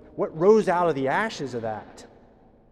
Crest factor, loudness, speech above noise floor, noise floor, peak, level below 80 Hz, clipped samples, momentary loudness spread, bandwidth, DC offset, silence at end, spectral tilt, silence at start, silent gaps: 18 dB; -23 LUFS; 31 dB; -54 dBFS; -8 dBFS; -60 dBFS; under 0.1%; 13 LU; 10.5 kHz; under 0.1%; 0.65 s; -6 dB/octave; 0.15 s; none